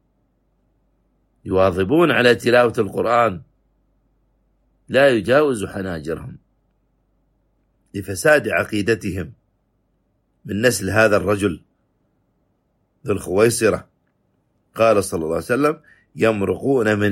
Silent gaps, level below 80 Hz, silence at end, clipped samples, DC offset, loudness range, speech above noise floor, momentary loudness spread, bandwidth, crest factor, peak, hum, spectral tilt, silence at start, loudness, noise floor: none; -52 dBFS; 0 s; under 0.1%; under 0.1%; 5 LU; 49 dB; 15 LU; 16.5 kHz; 18 dB; -2 dBFS; none; -5 dB/octave; 1.45 s; -18 LUFS; -66 dBFS